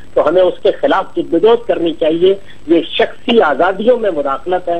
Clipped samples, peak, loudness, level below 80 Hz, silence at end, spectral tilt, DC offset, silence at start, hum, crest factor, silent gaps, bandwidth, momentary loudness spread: under 0.1%; 0 dBFS; -13 LUFS; -46 dBFS; 0 s; -6.5 dB/octave; 4%; 0.15 s; none; 12 dB; none; 8.4 kHz; 5 LU